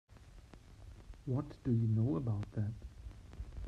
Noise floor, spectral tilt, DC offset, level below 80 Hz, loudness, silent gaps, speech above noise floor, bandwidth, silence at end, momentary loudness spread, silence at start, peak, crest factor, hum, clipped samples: -57 dBFS; -10 dB/octave; under 0.1%; -52 dBFS; -37 LUFS; none; 21 dB; 6.8 kHz; 0 s; 25 LU; 0.1 s; -24 dBFS; 16 dB; none; under 0.1%